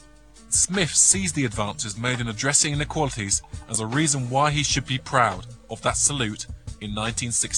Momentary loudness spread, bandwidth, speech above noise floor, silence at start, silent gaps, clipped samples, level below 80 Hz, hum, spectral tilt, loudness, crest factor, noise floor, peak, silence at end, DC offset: 11 LU; 14 kHz; 26 dB; 0.35 s; none; under 0.1%; -42 dBFS; none; -2.5 dB/octave; -22 LUFS; 20 dB; -50 dBFS; -4 dBFS; 0 s; 0.2%